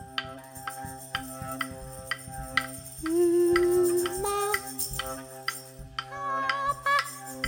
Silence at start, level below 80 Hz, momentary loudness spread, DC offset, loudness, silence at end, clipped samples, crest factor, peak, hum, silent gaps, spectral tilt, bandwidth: 0 s; -52 dBFS; 15 LU; under 0.1%; -29 LUFS; 0 s; under 0.1%; 22 dB; -8 dBFS; none; none; -3.5 dB/octave; 17.5 kHz